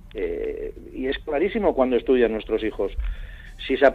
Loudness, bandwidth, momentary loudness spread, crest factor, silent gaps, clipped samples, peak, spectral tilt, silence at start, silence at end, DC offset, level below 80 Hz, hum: -24 LUFS; 7 kHz; 15 LU; 20 dB; none; under 0.1%; -4 dBFS; -7.5 dB/octave; 0.05 s; 0 s; under 0.1%; -36 dBFS; none